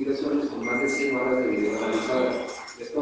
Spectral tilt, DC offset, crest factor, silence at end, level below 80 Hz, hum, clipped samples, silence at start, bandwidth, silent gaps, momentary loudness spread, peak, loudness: -4.5 dB/octave; under 0.1%; 14 dB; 0 s; -62 dBFS; none; under 0.1%; 0 s; 9.8 kHz; none; 8 LU; -12 dBFS; -26 LUFS